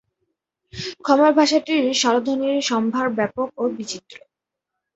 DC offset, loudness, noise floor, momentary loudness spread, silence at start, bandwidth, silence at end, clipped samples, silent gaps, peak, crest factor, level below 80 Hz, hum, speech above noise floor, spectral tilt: under 0.1%; -19 LUFS; -83 dBFS; 16 LU; 0.75 s; 8.2 kHz; 0.8 s; under 0.1%; none; -2 dBFS; 18 dB; -62 dBFS; none; 64 dB; -3.5 dB/octave